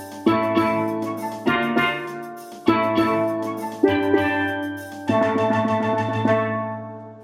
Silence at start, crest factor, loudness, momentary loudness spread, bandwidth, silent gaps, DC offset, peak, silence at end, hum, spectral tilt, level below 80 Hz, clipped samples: 0 s; 18 dB; -22 LUFS; 10 LU; 15.5 kHz; none; under 0.1%; -4 dBFS; 0 s; none; -6.5 dB/octave; -60 dBFS; under 0.1%